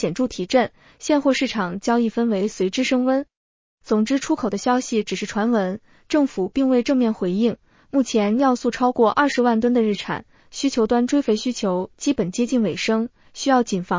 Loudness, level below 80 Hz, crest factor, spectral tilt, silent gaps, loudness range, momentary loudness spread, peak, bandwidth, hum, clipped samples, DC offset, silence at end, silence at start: -21 LUFS; -56 dBFS; 16 dB; -5 dB/octave; 3.37-3.78 s; 2 LU; 7 LU; -4 dBFS; 7.6 kHz; none; under 0.1%; under 0.1%; 0 s; 0 s